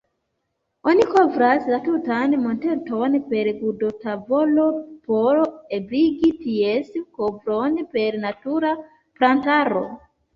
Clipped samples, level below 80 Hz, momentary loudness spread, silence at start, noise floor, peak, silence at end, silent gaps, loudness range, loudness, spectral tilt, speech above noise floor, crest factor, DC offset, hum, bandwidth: under 0.1%; -60 dBFS; 9 LU; 0.85 s; -75 dBFS; -4 dBFS; 0.35 s; none; 3 LU; -21 LUFS; -7 dB/octave; 55 dB; 18 dB; under 0.1%; none; 7.4 kHz